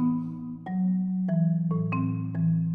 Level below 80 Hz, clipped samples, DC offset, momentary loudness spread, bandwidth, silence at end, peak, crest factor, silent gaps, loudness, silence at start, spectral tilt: -68 dBFS; under 0.1%; under 0.1%; 7 LU; 2.9 kHz; 0 s; -16 dBFS; 10 dB; none; -28 LUFS; 0 s; -12.5 dB/octave